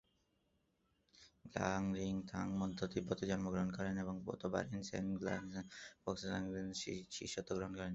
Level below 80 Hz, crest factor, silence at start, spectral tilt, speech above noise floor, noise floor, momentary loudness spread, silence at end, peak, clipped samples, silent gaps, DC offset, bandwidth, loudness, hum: -64 dBFS; 22 dB; 1.15 s; -5.5 dB/octave; 38 dB; -80 dBFS; 6 LU; 0 s; -20 dBFS; under 0.1%; none; under 0.1%; 8 kHz; -43 LUFS; none